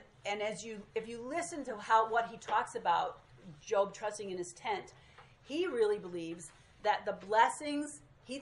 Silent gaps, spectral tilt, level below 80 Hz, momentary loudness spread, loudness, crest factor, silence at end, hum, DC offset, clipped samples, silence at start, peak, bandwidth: none; -3.5 dB/octave; -70 dBFS; 15 LU; -35 LUFS; 22 dB; 0 s; none; under 0.1%; under 0.1%; 0 s; -14 dBFS; 11.5 kHz